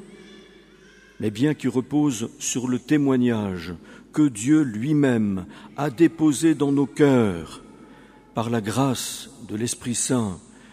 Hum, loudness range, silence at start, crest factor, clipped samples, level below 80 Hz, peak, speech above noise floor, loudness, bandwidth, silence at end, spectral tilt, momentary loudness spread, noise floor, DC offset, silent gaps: none; 4 LU; 0 s; 18 dB; under 0.1%; -58 dBFS; -4 dBFS; 29 dB; -23 LUFS; 15.5 kHz; 0.35 s; -5.5 dB/octave; 14 LU; -51 dBFS; under 0.1%; none